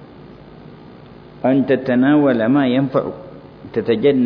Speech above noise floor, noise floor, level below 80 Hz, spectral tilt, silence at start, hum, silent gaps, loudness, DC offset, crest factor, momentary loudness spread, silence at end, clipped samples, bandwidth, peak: 25 dB; -40 dBFS; -54 dBFS; -10 dB/octave; 0.25 s; none; none; -16 LUFS; under 0.1%; 14 dB; 17 LU; 0 s; under 0.1%; 5.2 kHz; -4 dBFS